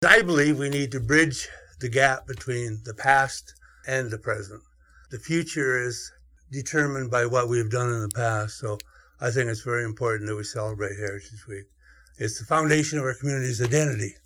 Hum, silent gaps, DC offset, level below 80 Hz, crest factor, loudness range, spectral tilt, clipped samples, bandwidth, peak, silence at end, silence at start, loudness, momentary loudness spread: none; none; under 0.1%; -54 dBFS; 26 dB; 6 LU; -4.5 dB/octave; under 0.1%; 17.5 kHz; 0 dBFS; 0.15 s; 0 s; -25 LUFS; 16 LU